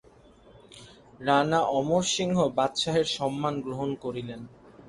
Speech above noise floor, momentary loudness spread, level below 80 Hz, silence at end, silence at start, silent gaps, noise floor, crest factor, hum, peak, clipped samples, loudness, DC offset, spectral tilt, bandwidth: 28 dB; 12 LU; -60 dBFS; 0 s; 0.7 s; none; -55 dBFS; 20 dB; none; -8 dBFS; under 0.1%; -27 LUFS; under 0.1%; -4.5 dB/octave; 11.5 kHz